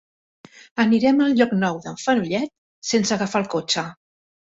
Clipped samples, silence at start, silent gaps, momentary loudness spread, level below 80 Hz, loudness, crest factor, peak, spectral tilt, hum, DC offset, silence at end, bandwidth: under 0.1%; 0.75 s; 2.58-2.82 s; 13 LU; -62 dBFS; -21 LUFS; 18 dB; -4 dBFS; -4.5 dB/octave; none; under 0.1%; 0.45 s; 8 kHz